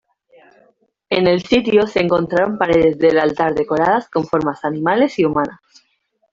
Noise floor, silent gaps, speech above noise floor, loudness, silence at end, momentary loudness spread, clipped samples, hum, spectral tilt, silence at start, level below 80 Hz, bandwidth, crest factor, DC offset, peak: -58 dBFS; none; 42 dB; -16 LUFS; 0.8 s; 6 LU; under 0.1%; none; -6.5 dB/octave; 1.1 s; -48 dBFS; 7.6 kHz; 16 dB; under 0.1%; -2 dBFS